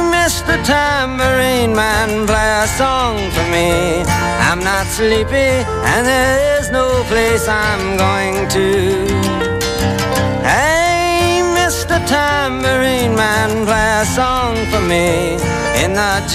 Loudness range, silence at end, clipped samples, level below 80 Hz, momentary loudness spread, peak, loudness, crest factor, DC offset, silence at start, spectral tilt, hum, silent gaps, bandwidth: 1 LU; 0 s; under 0.1%; -28 dBFS; 3 LU; -2 dBFS; -14 LUFS; 12 dB; under 0.1%; 0 s; -4 dB/octave; none; none; 16 kHz